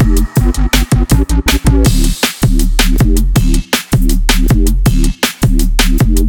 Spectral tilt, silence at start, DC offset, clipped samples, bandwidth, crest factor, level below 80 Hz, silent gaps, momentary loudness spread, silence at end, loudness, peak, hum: -4.5 dB/octave; 0 s; under 0.1%; under 0.1%; 19 kHz; 10 dB; -12 dBFS; none; 2 LU; 0 s; -12 LUFS; 0 dBFS; none